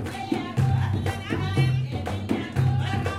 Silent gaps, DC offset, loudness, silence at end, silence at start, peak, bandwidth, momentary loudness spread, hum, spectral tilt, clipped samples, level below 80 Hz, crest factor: none; under 0.1%; -26 LUFS; 0 s; 0 s; -10 dBFS; 13 kHz; 6 LU; none; -7 dB/octave; under 0.1%; -48 dBFS; 16 dB